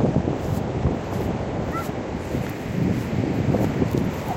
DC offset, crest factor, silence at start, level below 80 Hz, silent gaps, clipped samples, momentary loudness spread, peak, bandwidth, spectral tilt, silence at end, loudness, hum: under 0.1%; 16 dB; 0 s; -38 dBFS; none; under 0.1%; 6 LU; -8 dBFS; 16 kHz; -7.5 dB/octave; 0 s; -25 LUFS; none